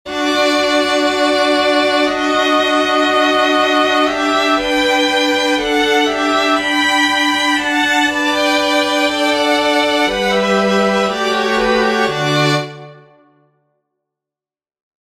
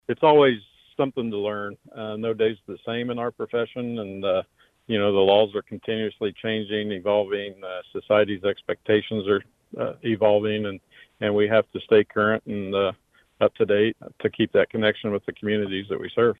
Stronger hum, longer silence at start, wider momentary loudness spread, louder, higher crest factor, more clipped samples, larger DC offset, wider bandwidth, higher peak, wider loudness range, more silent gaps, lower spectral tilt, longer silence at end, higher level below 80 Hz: neither; about the same, 0.05 s vs 0.1 s; second, 2 LU vs 11 LU; first, -13 LUFS vs -24 LUFS; about the same, 14 dB vs 18 dB; neither; neither; first, 15 kHz vs 4.2 kHz; about the same, -2 dBFS vs -4 dBFS; about the same, 4 LU vs 5 LU; neither; second, -3.5 dB/octave vs -8 dB/octave; first, 2.25 s vs 0.05 s; first, -46 dBFS vs -64 dBFS